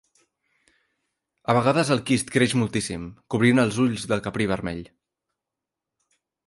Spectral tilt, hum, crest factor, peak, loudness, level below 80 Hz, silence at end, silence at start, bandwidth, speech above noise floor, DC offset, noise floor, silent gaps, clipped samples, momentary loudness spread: -5.5 dB/octave; none; 20 dB; -6 dBFS; -23 LUFS; -54 dBFS; 1.65 s; 1.5 s; 11.5 kHz; 64 dB; under 0.1%; -86 dBFS; none; under 0.1%; 12 LU